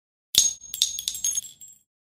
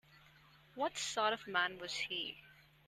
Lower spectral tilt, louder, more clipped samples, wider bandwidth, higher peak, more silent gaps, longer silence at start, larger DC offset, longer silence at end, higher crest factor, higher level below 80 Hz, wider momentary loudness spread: second, 2.5 dB/octave vs -1.5 dB/octave; first, -23 LUFS vs -38 LUFS; neither; first, 16 kHz vs 13.5 kHz; first, 0 dBFS vs -20 dBFS; neither; first, 0.35 s vs 0.15 s; neither; about the same, 0.35 s vs 0.25 s; first, 28 dB vs 22 dB; first, -60 dBFS vs -76 dBFS; second, 8 LU vs 11 LU